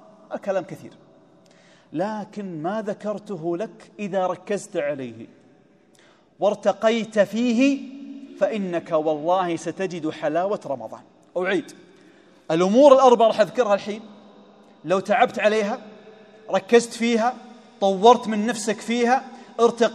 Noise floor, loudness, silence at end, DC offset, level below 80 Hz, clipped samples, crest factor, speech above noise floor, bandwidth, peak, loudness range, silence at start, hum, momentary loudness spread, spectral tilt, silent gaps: -56 dBFS; -22 LUFS; 0 s; under 0.1%; -76 dBFS; under 0.1%; 22 dB; 35 dB; 12.5 kHz; 0 dBFS; 10 LU; 0.3 s; none; 18 LU; -5 dB/octave; none